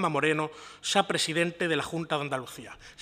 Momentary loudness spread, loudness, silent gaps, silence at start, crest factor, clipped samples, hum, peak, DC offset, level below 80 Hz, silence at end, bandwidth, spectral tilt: 13 LU; -28 LUFS; none; 0 s; 24 dB; under 0.1%; none; -6 dBFS; under 0.1%; -64 dBFS; 0 s; 16 kHz; -3.5 dB/octave